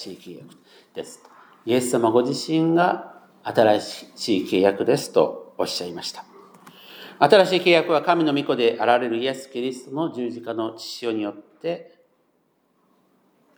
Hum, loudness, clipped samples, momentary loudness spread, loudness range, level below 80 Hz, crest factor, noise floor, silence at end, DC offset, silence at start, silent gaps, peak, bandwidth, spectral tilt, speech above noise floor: none; -22 LUFS; under 0.1%; 19 LU; 10 LU; -78 dBFS; 22 dB; -66 dBFS; 1.75 s; under 0.1%; 0 s; none; 0 dBFS; over 20 kHz; -5 dB/octave; 45 dB